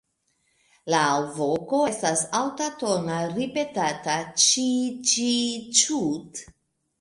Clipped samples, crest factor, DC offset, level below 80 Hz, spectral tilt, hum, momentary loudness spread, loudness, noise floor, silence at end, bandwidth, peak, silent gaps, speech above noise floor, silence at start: under 0.1%; 20 dB; under 0.1%; -66 dBFS; -2.5 dB/octave; none; 9 LU; -23 LUFS; -71 dBFS; 0.55 s; 11.5 kHz; -4 dBFS; none; 47 dB; 0.85 s